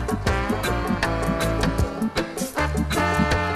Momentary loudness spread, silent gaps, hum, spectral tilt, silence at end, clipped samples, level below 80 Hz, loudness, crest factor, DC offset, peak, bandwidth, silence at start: 5 LU; none; none; -5.5 dB/octave; 0 s; under 0.1%; -30 dBFS; -23 LUFS; 16 dB; under 0.1%; -6 dBFS; 15.5 kHz; 0 s